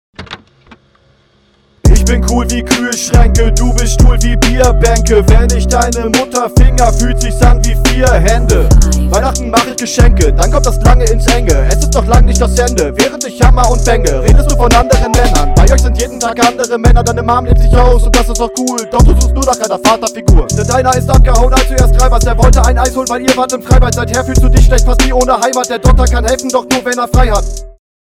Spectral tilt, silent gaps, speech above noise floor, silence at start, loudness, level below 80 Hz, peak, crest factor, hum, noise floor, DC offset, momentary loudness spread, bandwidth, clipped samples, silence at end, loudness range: -5 dB/octave; none; 43 dB; 0.2 s; -10 LUFS; -10 dBFS; 0 dBFS; 8 dB; none; -50 dBFS; under 0.1%; 4 LU; 15 kHz; 1%; 0.35 s; 1 LU